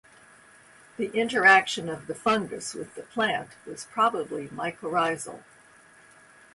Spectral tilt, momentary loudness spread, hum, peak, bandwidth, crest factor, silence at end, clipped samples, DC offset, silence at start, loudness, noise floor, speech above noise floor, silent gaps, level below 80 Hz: -3 dB/octave; 20 LU; none; -4 dBFS; 11.5 kHz; 24 dB; 1.15 s; under 0.1%; under 0.1%; 1 s; -25 LUFS; -55 dBFS; 28 dB; none; -68 dBFS